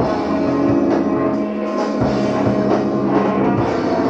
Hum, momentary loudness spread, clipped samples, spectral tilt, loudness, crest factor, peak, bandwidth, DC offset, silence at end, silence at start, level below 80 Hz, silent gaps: none; 4 LU; under 0.1%; -8 dB/octave; -17 LUFS; 14 dB; -4 dBFS; 8 kHz; under 0.1%; 0 s; 0 s; -42 dBFS; none